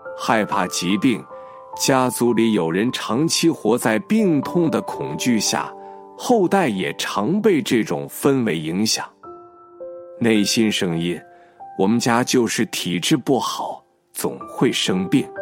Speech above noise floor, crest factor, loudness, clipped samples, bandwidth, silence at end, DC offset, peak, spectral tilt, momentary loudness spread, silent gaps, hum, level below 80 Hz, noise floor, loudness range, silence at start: 23 dB; 18 dB; -20 LUFS; under 0.1%; 16.5 kHz; 0 s; under 0.1%; -2 dBFS; -4.5 dB/octave; 14 LU; none; none; -64 dBFS; -42 dBFS; 2 LU; 0 s